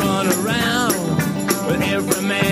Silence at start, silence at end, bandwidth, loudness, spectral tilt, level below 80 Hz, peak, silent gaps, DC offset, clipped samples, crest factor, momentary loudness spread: 0 s; 0 s; 15.5 kHz; -19 LUFS; -4 dB/octave; -46 dBFS; -2 dBFS; none; under 0.1%; under 0.1%; 16 dB; 3 LU